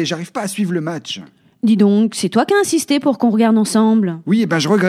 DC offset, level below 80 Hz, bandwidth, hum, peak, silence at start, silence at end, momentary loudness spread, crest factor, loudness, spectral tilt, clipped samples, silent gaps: under 0.1%; -66 dBFS; 14.5 kHz; none; -2 dBFS; 0 s; 0 s; 10 LU; 14 dB; -16 LUFS; -5 dB/octave; under 0.1%; none